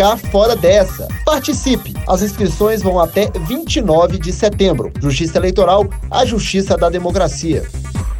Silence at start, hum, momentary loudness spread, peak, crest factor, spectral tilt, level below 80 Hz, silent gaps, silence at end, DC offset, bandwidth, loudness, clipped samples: 0 s; none; 7 LU; 0 dBFS; 14 dB; -5 dB/octave; -26 dBFS; none; 0 s; under 0.1%; 19 kHz; -15 LUFS; under 0.1%